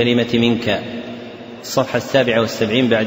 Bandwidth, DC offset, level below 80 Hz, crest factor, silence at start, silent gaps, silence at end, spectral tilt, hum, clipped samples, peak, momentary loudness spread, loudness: 16.5 kHz; under 0.1%; -52 dBFS; 16 dB; 0 s; none; 0 s; -5 dB/octave; none; under 0.1%; -2 dBFS; 16 LU; -17 LUFS